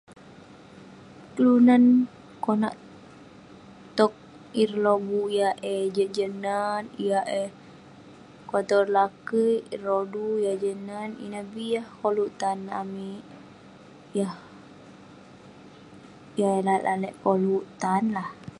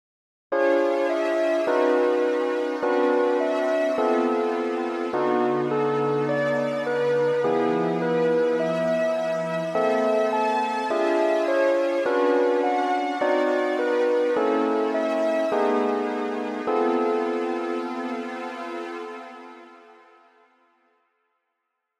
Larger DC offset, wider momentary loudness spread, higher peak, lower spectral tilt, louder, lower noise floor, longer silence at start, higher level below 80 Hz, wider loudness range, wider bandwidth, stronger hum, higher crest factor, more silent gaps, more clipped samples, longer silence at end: neither; first, 14 LU vs 7 LU; first, -6 dBFS vs -10 dBFS; about the same, -6.5 dB/octave vs -6 dB/octave; about the same, -25 LUFS vs -23 LUFS; second, -49 dBFS vs -79 dBFS; second, 0.1 s vs 0.5 s; first, -68 dBFS vs -80 dBFS; about the same, 9 LU vs 7 LU; about the same, 11.5 kHz vs 11.5 kHz; neither; first, 20 dB vs 14 dB; neither; neither; second, 0.05 s vs 2.25 s